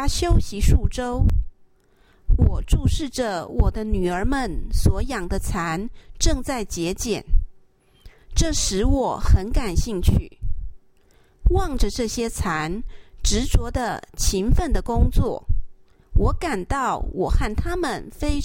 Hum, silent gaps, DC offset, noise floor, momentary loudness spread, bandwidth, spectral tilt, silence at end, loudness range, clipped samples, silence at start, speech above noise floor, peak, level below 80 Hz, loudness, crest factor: none; none; under 0.1%; -56 dBFS; 8 LU; 16.5 kHz; -5 dB/octave; 0 s; 2 LU; under 0.1%; 0 s; 36 dB; -4 dBFS; -24 dBFS; -24 LUFS; 16 dB